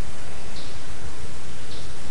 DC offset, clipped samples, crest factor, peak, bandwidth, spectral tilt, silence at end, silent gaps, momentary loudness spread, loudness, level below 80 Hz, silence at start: 20%; under 0.1%; 14 dB; -12 dBFS; 11.5 kHz; -4 dB/octave; 0 s; none; 1 LU; -38 LUFS; -44 dBFS; 0 s